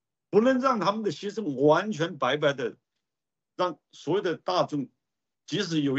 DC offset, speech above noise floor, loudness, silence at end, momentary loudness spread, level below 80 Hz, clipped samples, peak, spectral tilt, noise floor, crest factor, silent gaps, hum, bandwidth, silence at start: under 0.1%; 64 dB; -27 LUFS; 0 s; 11 LU; -76 dBFS; under 0.1%; -8 dBFS; -5.5 dB/octave; -90 dBFS; 18 dB; none; none; 8 kHz; 0.3 s